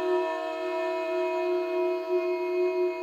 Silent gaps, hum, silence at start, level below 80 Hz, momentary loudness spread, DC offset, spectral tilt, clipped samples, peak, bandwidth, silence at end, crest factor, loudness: none; none; 0 s; -74 dBFS; 3 LU; under 0.1%; -3.5 dB/octave; under 0.1%; -16 dBFS; 7.2 kHz; 0 s; 12 dB; -28 LUFS